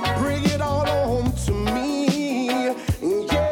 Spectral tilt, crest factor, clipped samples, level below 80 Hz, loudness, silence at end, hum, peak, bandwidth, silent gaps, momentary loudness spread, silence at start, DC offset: -5.5 dB/octave; 16 dB; under 0.1%; -34 dBFS; -23 LUFS; 0 s; none; -6 dBFS; 18 kHz; none; 2 LU; 0 s; under 0.1%